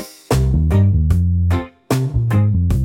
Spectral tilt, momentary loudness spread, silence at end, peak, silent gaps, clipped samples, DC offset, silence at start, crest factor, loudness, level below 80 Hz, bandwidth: -7.5 dB/octave; 6 LU; 0 s; -4 dBFS; none; under 0.1%; under 0.1%; 0 s; 12 dB; -17 LUFS; -24 dBFS; 16.5 kHz